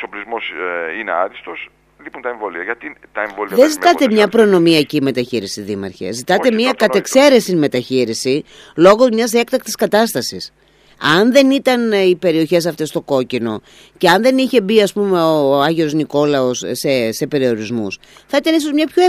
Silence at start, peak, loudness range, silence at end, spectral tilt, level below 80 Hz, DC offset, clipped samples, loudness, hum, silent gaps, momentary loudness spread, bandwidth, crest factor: 0 s; 0 dBFS; 3 LU; 0 s; -4.5 dB/octave; -56 dBFS; under 0.1%; under 0.1%; -15 LUFS; none; none; 13 LU; 15.5 kHz; 14 dB